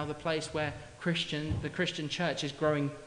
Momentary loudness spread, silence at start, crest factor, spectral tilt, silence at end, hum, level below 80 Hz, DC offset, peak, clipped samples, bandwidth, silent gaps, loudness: 5 LU; 0 s; 18 dB; -5 dB/octave; 0 s; none; -56 dBFS; under 0.1%; -16 dBFS; under 0.1%; 11 kHz; none; -33 LUFS